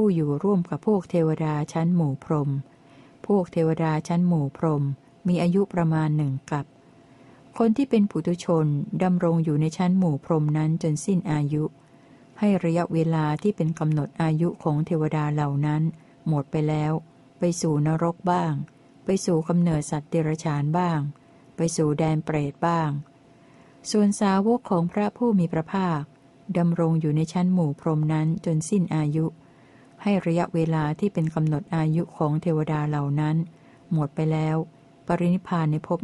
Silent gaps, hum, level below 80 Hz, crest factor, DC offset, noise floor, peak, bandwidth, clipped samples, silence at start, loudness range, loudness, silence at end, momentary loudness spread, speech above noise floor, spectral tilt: none; none; -58 dBFS; 16 dB; under 0.1%; -53 dBFS; -8 dBFS; 11.5 kHz; under 0.1%; 0 s; 2 LU; -24 LUFS; 0 s; 6 LU; 30 dB; -7.5 dB/octave